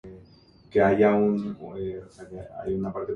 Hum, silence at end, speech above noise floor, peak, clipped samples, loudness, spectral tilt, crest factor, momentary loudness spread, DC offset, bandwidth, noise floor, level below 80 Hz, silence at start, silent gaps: none; 0 s; 29 dB; -8 dBFS; under 0.1%; -25 LUFS; -8.5 dB/octave; 18 dB; 20 LU; under 0.1%; 6.8 kHz; -54 dBFS; -54 dBFS; 0.05 s; none